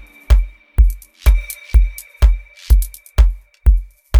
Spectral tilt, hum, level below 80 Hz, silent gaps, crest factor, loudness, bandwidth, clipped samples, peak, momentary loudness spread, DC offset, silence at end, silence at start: -5.5 dB/octave; none; -14 dBFS; none; 14 dB; -18 LUFS; 19.5 kHz; under 0.1%; 0 dBFS; 5 LU; under 0.1%; 0 s; 0.3 s